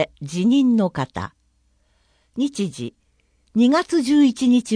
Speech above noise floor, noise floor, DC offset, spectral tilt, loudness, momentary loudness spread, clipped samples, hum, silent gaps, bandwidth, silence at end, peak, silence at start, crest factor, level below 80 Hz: 45 dB; -63 dBFS; under 0.1%; -5.5 dB/octave; -19 LUFS; 17 LU; under 0.1%; none; none; 10.5 kHz; 0 s; -6 dBFS; 0 s; 16 dB; -56 dBFS